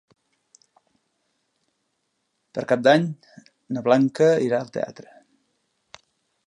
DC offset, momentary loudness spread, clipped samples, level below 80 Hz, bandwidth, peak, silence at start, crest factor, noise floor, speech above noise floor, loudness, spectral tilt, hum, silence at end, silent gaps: under 0.1%; 15 LU; under 0.1%; -74 dBFS; 11 kHz; -4 dBFS; 2.55 s; 22 dB; -75 dBFS; 54 dB; -21 LUFS; -6.5 dB/octave; none; 1.55 s; none